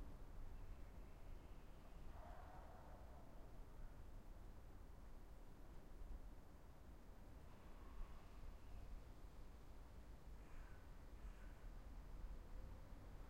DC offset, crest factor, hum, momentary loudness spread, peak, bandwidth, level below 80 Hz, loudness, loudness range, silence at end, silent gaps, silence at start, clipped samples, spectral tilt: under 0.1%; 16 dB; none; 4 LU; -42 dBFS; 16 kHz; -58 dBFS; -63 LUFS; 2 LU; 0 s; none; 0 s; under 0.1%; -6.5 dB/octave